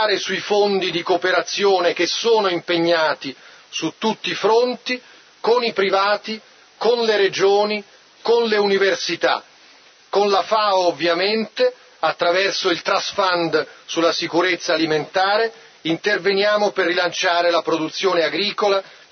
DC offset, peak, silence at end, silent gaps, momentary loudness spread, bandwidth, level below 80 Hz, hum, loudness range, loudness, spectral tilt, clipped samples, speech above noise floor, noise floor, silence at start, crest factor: under 0.1%; -4 dBFS; 0.2 s; none; 7 LU; 6.6 kHz; -72 dBFS; none; 2 LU; -19 LUFS; -3 dB/octave; under 0.1%; 30 dB; -49 dBFS; 0 s; 16 dB